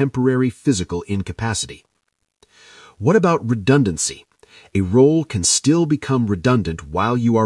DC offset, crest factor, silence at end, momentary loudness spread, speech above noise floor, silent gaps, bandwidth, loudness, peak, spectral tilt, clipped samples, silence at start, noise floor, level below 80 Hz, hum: under 0.1%; 18 dB; 0 s; 10 LU; 54 dB; none; 12 kHz; -18 LUFS; -2 dBFS; -5 dB/octave; under 0.1%; 0 s; -72 dBFS; -48 dBFS; none